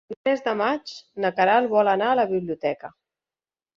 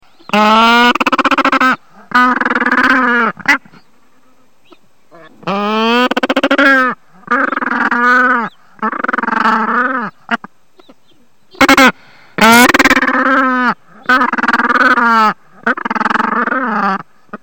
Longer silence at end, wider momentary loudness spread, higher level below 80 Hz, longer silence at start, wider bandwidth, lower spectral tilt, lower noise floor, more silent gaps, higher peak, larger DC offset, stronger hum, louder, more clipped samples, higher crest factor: first, 0.9 s vs 0.05 s; about the same, 12 LU vs 12 LU; second, -68 dBFS vs -46 dBFS; second, 0.1 s vs 0.3 s; second, 7.4 kHz vs 17.5 kHz; first, -6 dB/octave vs -3 dB/octave; first, under -90 dBFS vs -54 dBFS; first, 0.17-0.24 s vs none; second, -6 dBFS vs 0 dBFS; second, under 0.1% vs 0.7%; neither; second, -23 LUFS vs -11 LUFS; neither; first, 18 dB vs 12 dB